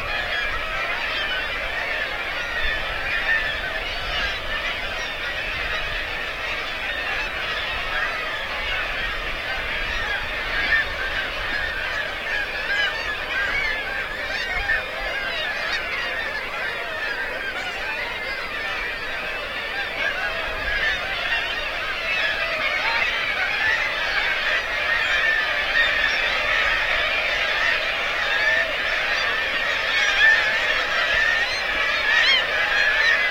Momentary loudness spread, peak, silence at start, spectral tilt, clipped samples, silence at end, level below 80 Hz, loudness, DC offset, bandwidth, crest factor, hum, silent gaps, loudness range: 8 LU; -6 dBFS; 0 s; -2 dB/octave; under 0.1%; 0 s; -40 dBFS; -22 LUFS; under 0.1%; 16.5 kHz; 18 dB; none; none; 6 LU